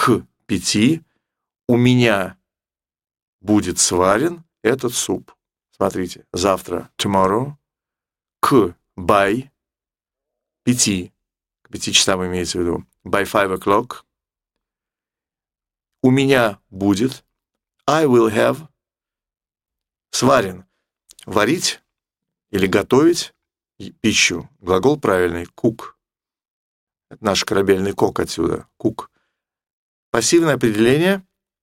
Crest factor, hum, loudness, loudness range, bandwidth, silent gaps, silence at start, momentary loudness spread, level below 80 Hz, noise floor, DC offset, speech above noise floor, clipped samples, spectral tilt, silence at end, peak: 20 dB; none; -18 LUFS; 3 LU; 16.5 kHz; 3.22-3.39 s, 26.48-26.87 s, 29.73-30.13 s; 0 s; 12 LU; -50 dBFS; under -90 dBFS; under 0.1%; over 73 dB; under 0.1%; -4 dB/octave; 0.45 s; 0 dBFS